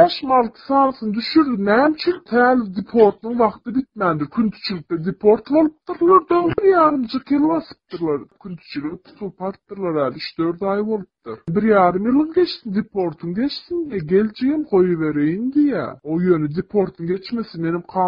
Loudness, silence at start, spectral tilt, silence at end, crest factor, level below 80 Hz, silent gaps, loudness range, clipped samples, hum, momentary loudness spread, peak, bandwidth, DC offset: -19 LUFS; 0 s; -9 dB/octave; 0 s; 18 dB; -54 dBFS; none; 7 LU; under 0.1%; none; 12 LU; 0 dBFS; 5.4 kHz; under 0.1%